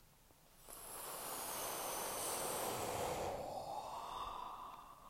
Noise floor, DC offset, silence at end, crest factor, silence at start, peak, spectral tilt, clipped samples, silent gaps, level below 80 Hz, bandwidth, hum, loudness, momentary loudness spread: -67 dBFS; under 0.1%; 0 s; 16 dB; 0 s; -30 dBFS; -2 dB/octave; under 0.1%; none; -66 dBFS; 16 kHz; none; -44 LUFS; 11 LU